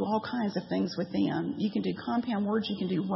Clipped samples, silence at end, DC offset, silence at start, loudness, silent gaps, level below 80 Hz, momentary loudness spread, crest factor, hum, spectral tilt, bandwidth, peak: under 0.1%; 0 s; under 0.1%; 0 s; -31 LUFS; none; -70 dBFS; 2 LU; 14 dB; none; -8 dB/octave; 6 kHz; -16 dBFS